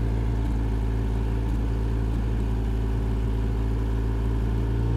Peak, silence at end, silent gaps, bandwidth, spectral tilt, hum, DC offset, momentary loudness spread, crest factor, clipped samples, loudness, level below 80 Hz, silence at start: -16 dBFS; 0 s; none; 5.4 kHz; -8.5 dB/octave; none; under 0.1%; 1 LU; 8 dB; under 0.1%; -27 LUFS; -26 dBFS; 0 s